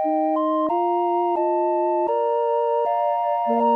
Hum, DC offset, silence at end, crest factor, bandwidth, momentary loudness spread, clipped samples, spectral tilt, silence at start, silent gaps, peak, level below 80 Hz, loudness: none; under 0.1%; 0 s; 10 dB; 4.9 kHz; 0 LU; under 0.1%; -7.5 dB/octave; 0 s; none; -10 dBFS; -74 dBFS; -21 LUFS